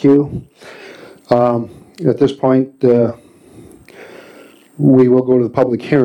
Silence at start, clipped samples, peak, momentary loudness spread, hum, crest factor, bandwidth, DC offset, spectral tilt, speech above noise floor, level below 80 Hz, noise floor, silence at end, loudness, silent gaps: 0 s; under 0.1%; 0 dBFS; 20 LU; none; 14 dB; 9.2 kHz; under 0.1%; -9 dB/octave; 29 dB; -50 dBFS; -42 dBFS; 0 s; -14 LUFS; none